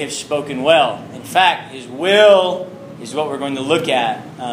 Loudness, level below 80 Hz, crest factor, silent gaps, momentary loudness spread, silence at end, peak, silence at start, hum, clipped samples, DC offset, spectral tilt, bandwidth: -16 LUFS; -62 dBFS; 16 dB; none; 16 LU; 0 s; 0 dBFS; 0 s; none; under 0.1%; under 0.1%; -3.5 dB/octave; 15.5 kHz